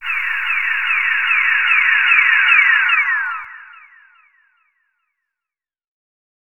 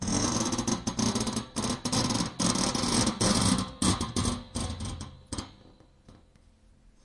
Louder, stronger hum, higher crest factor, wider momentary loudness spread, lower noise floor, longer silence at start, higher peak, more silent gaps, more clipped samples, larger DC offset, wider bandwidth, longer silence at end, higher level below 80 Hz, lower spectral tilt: first, -13 LUFS vs -28 LUFS; neither; about the same, 18 dB vs 20 dB; second, 9 LU vs 14 LU; first, -88 dBFS vs -59 dBFS; about the same, 0 s vs 0 s; first, 0 dBFS vs -10 dBFS; neither; neither; neither; first, 19 kHz vs 11.5 kHz; first, 2.75 s vs 0.9 s; second, -72 dBFS vs -46 dBFS; second, 2.5 dB/octave vs -3.5 dB/octave